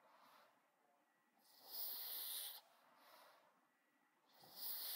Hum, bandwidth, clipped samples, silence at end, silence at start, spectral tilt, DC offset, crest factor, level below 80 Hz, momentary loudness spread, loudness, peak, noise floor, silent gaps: none; 16 kHz; under 0.1%; 0 s; 0 s; 1.5 dB/octave; under 0.1%; 20 dB; under -90 dBFS; 23 LU; -48 LUFS; -36 dBFS; -81 dBFS; none